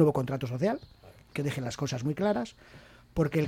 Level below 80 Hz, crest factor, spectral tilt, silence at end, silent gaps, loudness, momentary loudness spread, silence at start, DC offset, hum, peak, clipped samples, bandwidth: -56 dBFS; 20 dB; -7 dB/octave; 0 s; none; -32 LUFS; 9 LU; 0 s; under 0.1%; none; -10 dBFS; under 0.1%; 16 kHz